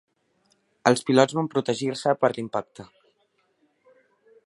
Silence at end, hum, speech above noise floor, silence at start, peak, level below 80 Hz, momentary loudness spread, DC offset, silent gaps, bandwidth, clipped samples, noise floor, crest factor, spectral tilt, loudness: 1.6 s; none; 46 dB; 0.85 s; -2 dBFS; -70 dBFS; 11 LU; under 0.1%; none; 11.5 kHz; under 0.1%; -69 dBFS; 24 dB; -5 dB/octave; -24 LUFS